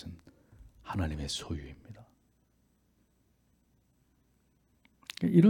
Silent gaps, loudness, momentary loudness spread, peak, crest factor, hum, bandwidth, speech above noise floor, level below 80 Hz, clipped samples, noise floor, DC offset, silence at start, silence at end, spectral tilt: none; -35 LUFS; 19 LU; -12 dBFS; 22 dB; none; 12.5 kHz; 43 dB; -54 dBFS; under 0.1%; -71 dBFS; under 0.1%; 0.05 s; 0 s; -6.5 dB/octave